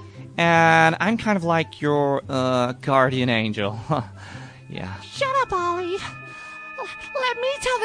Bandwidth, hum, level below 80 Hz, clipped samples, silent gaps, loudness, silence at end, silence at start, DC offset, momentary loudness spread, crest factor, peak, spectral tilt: 10.5 kHz; none; -54 dBFS; under 0.1%; none; -21 LUFS; 0 s; 0 s; under 0.1%; 19 LU; 20 dB; -4 dBFS; -5.5 dB/octave